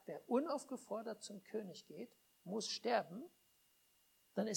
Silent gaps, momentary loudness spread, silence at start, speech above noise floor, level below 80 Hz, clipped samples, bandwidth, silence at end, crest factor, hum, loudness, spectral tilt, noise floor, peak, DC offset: none; 16 LU; 0.05 s; 32 dB; under -90 dBFS; under 0.1%; 19 kHz; 0 s; 22 dB; none; -43 LUFS; -4 dB/octave; -75 dBFS; -22 dBFS; under 0.1%